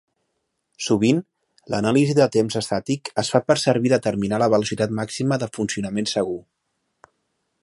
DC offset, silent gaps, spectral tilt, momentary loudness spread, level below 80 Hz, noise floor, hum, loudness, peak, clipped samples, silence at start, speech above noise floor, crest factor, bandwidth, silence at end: under 0.1%; none; -5.5 dB/octave; 7 LU; -58 dBFS; -75 dBFS; none; -21 LUFS; -2 dBFS; under 0.1%; 0.8 s; 54 dB; 20 dB; 11.5 kHz; 1.2 s